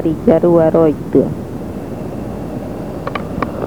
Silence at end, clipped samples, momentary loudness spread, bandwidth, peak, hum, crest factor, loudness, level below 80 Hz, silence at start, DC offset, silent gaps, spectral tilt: 0 s; under 0.1%; 14 LU; 19.5 kHz; 0 dBFS; none; 16 dB; -16 LUFS; -36 dBFS; 0 s; 1%; none; -9 dB/octave